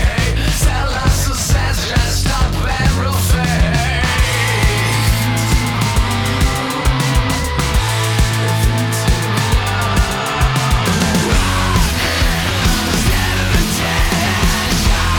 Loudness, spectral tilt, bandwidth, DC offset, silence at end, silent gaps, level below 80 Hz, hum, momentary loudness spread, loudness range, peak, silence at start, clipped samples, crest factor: -15 LUFS; -4 dB/octave; 20 kHz; under 0.1%; 0 s; none; -18 dBFS; none; 2 LU; 1 LU; -4 dBFS; 0 s; under 0.1%; 10 dB